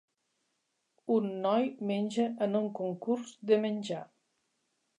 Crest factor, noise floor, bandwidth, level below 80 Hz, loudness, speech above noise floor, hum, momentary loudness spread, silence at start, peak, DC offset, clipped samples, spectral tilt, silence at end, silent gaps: 20 dB; -80 dBFS; 10 kHz; -86 dBFS; -32 LUFS; 49 dB; none; 8 LU; 1.05 s; -14 dBFS; under 0.1%; under 0.1%; -6.5 dB/octave; 0.95 s; none